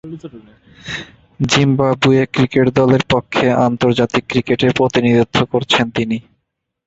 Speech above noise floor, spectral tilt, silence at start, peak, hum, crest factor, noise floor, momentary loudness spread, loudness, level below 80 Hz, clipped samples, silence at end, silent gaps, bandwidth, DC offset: 58 dB; -5.5 dB/octave; 0.05 s; 0 dBFS; none; 16 dB; -73 dBFS; 14 LU; -15 LUFS; -44 dBFS; under 0.1%; 0.65 s; none; 8 kHz; under 0.1%